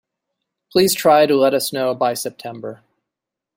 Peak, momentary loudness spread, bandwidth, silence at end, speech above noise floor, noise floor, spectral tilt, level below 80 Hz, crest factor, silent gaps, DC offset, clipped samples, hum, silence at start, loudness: -2 dBFS; 18 LU; 16.5 kHz; 0.8 s; 67 dB; -84 dBFS; -3.5 dB/octave; -60 dBFS; 18 dB; none; under 0.1%; under 0.1%; none; 0.75 s; -16 LUFS